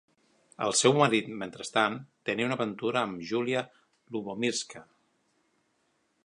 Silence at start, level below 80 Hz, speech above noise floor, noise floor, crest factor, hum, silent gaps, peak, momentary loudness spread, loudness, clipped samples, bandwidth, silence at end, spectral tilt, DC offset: 0.6 s; -74 dBFS; 45 dB; -73 dBFS; 24 dB; none; none; -8 dBFS; 15 LU; -29 LUFS; under 0.1%; 11.5 kHz; 1.4 s; -3.5 dB/octave; under 0.1%